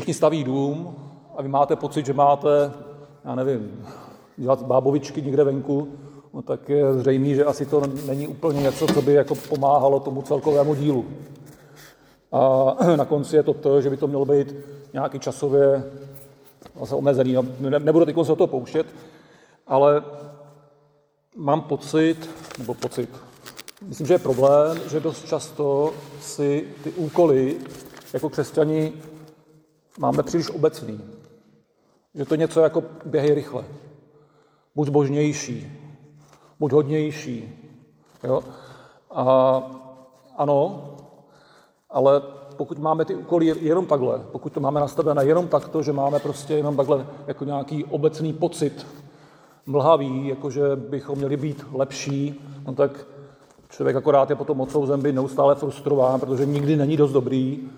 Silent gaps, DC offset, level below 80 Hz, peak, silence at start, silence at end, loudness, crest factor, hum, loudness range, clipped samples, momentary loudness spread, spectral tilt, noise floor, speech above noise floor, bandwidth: none; under 0.1%; -62 dBFS; -4 dBFS; 0 s; 0 s; -22 LUFS; 18 dB; none; 5 LU; under 0.1%; 18 LU; -7 dB/octave; -64 dBFS; 43 dB; over 20 kHz